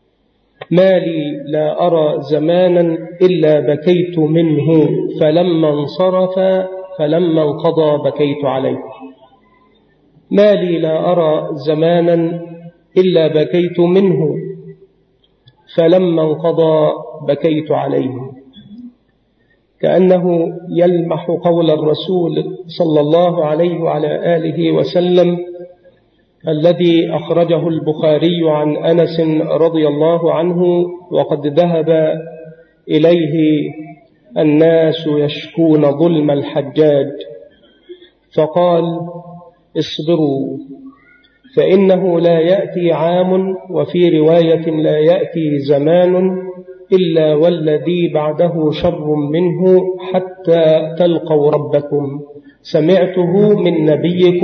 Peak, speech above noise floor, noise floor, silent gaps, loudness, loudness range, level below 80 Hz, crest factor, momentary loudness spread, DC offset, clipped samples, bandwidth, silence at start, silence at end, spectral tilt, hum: 0 dBFS; 46 dB; -58 dBFS; none; -13 LUFS; 4 LU; -56 dBFS; 12 dB; 9 LU; under 0.1%; under 0.1%; 6.4 kHz; 0.6 s; 0 s; -9 dB/octave; none